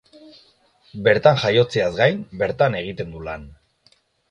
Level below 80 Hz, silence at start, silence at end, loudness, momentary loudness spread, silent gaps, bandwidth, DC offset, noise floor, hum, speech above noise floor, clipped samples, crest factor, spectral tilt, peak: -50 dBFS; 0.95 s; 0.8 s; -19 LUFS; 17 LU; none; 9.8 kHz; under 0.1%; -60 dBFS; none; 41 dB; under 0.1%; 20 dB; -6 dB/octave; 0 dBFS